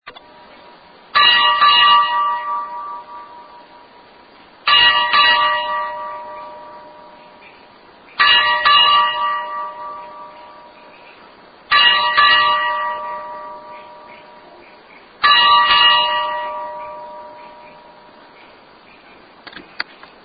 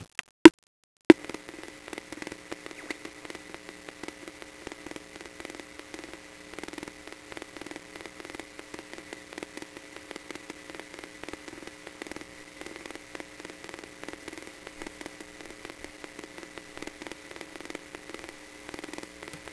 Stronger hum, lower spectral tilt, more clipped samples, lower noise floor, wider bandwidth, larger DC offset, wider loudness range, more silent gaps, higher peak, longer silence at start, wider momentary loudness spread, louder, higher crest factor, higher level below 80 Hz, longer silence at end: neither; about the same, -5 dB/octave vs -4 dB/octave; neither; about the same, -45 dBFS vs -46 dBFS; second, 5 kHz vs 11 kHz; neither; second, 5 LU vs 14 LU; second, none vs 0.31-0.45 s, 0.54-0.58 s, 0.67-1.10 s; about the same, 0 dBFS vs 0 dBFS; about the same, 0.05 s vs 0 s; first, 23 LU vs 5 LU; first, -12 LUFS vs -24 LUFS; second, 18 dB vs 30 dB; first, -56 dBFS vs -62 dBFS; first, 0.4 s vs 0 s